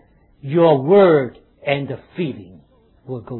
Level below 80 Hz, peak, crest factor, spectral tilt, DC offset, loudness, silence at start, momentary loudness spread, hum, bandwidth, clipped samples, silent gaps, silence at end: -58 dBFS; -2 dBFS; 16 dB; -11.5 dB/octave; under 0.1%; -16 LUFS; 0.45 s; 20 LU; none; 4.2 kHz; under 0.1%; none; 0 s